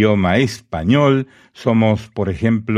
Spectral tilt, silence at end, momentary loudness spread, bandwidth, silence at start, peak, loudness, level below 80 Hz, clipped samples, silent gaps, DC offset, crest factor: -7 dB/octave; 0 s; 9 LU; 13 kHz; 0 s; -2 dBFS; -17 LUFS; -42 dBFS; under 0.1%; none; under 0.1%; 14 dB